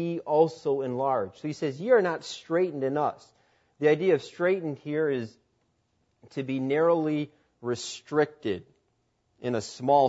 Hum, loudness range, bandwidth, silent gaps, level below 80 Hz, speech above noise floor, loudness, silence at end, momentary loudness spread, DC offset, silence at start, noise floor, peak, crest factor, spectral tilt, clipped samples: none; 3 LU; 8 kHz; none; -74 dBFS; 46 dB; -28 LUFS; 0 s; 11 LU; under 0.1%; 0 s; -73 dBFS; -8 dBFS; 18 dB; -6 dB/octave; under 0.1%